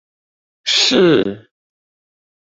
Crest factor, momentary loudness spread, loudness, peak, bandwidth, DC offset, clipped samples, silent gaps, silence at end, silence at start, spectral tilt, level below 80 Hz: 16 dB; 13 LU; -13 LUFS; -2 dBFS; 8 kHz; under 0.1%; under 0.1%; none; 1.05 s; 0.65 s; -3.5 dB/octave; -58 dBFS